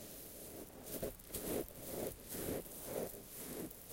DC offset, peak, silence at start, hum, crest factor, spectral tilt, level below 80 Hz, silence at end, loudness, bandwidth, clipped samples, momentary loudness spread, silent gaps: under 0.1%; -24 dBFS; 0 s; none; 22 dB; -4 dB/octave; -60 dBFS; 0 s; -45 LUFS; 17 kHz; under 0.1%; 8 LU; none